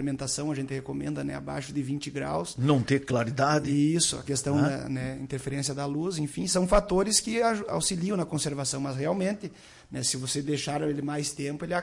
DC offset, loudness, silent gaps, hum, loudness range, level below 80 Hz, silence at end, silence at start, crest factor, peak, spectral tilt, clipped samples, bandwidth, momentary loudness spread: under 0.1%; -28 LUFS; none; none; 3 LU; -48 dBFS; 0 s; 0 s; 18 dB; -10 dBFS; -4.5 dB/octave; under 0.1%; 11.5 kHz; 10 LU